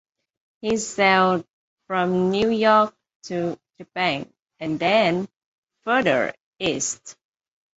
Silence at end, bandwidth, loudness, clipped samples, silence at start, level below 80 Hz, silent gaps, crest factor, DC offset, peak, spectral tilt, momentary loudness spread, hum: 0.65 s; 8.2 kHz; -22 LUFS; under 0.1%; 0.65 s; -60 dBFS; 1.53-1.77 s, 3.15-3.20 s, 4.42-4.46 s, 5.37-5.63 s, 6.40-6.53 s; 20 dB; under 0.1%; -4 dBFS; -4 dB/octave; 16 LU; none